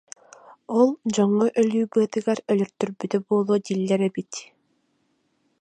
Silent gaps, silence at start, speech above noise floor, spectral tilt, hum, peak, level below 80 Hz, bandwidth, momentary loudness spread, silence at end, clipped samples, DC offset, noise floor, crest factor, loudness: none; 0.7 s; 47 dB; -6 dB/octave; none; -6 dBFS; -74 dBFS; 9.4 kHz; 12 LU; 1.15 s; under 0.1%; under 0.1%; -69 dBFS; 18 dB; -23 LUFS